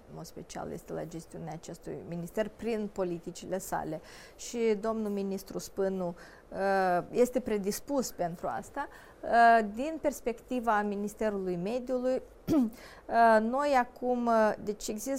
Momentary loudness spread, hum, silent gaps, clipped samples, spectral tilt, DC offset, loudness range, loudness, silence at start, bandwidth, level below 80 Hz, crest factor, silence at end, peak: 17 LU; none; none; under 0.1%; -5 dB/octave; under 0.1%; 8 LU; -31 LUFS; 0.1 s; 16 kHz; -58 dBFS; 20 dB; 0 s; -12 dBFS